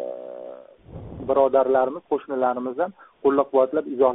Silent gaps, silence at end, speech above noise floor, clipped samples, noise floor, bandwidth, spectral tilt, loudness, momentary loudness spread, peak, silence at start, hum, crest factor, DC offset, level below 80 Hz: none; 0 s; 21 dB; under 0.1%; -42 dBFS; 3.9 kHz; -2.5 dB/octave; -22 LUFS; 20 LU; -6 dBFS; 0 s; none; 16 dB; under 0.1%; -56 dBFS